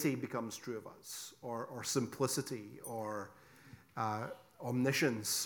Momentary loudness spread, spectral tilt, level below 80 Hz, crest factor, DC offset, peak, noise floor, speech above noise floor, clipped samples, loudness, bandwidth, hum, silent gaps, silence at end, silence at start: 14 LU; -4 dB/octave; -78 dBFS; 20 dB; under 0.1%; -18 dBFS; -59 dBFS; 21 dB; under 0.1%; -39 LUFS; 19 kHz; none; none; 0 s; 0 s